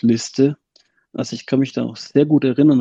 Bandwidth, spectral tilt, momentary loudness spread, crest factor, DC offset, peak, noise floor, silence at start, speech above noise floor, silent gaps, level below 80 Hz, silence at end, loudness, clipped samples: 8 kHz; -6.5 dB/octave; 13 LU; 16 dB; under 0.1%; -2 dBFS; -59 dBFS; 0.05 s; 42 dB; none; -64 dBFS; 0 s; -18 LUFS; under 0.1%